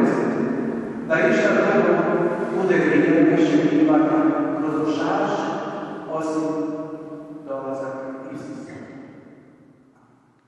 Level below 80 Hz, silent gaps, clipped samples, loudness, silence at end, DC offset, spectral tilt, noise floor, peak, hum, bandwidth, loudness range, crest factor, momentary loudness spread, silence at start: -64 dBFS; none; under 0.1%; -21 LUFS; 1.15 s; under 0.1%; -7 dB/octave; -56 dBFS; -6 dBFS; none; 8.6 kHz; 15 LU; 16 dB; 17 LU; 0 s